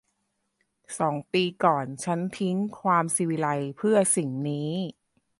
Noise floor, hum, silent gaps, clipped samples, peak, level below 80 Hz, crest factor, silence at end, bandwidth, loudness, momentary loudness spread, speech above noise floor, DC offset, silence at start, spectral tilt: -77 dBFS; none; none; under 0.1%; -6 dBFS; -72 dBFS; 20 dB; 0.5 s; 11.5 kHz; -26 LUFS; 7 LU; 51 dB; under 0.1%; 0.9 s; -4.5 dB/octave